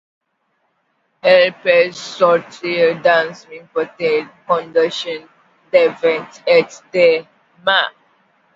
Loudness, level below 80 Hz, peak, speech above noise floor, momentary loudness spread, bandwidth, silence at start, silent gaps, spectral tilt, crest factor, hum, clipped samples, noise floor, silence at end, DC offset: -16 LUFS; -66 dBFS; 0 dBFS; 51 dB; 11 LU; 7.8 kHz; 1.25 s; none; -4 dB/octave; 18 dB; none; under 0.1%; -67 dBFS; 0.65 s; under 0.1%